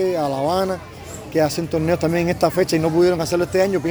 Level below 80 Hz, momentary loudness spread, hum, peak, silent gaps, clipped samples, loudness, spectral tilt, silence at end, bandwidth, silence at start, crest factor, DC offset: -46 dBFS; 8 LU; none; -4 dBFS; none; under 0.1%; -19 LUFS; -6 dB/octave; 0 s; over 20 kHz; 0 s; 16 dB; under 0.1%